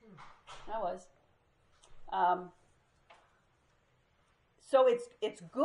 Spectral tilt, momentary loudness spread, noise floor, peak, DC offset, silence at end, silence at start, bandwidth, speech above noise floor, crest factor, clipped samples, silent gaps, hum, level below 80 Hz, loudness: -5 dB/octave; 25 LU; -72 dBFS; -14 dBFS; under 0.1%; 0 s; 0.2 s; 11 kHz; 40 dB; 22 dB; under 0.1%; none; none; -68 dBFS; -33 LUFS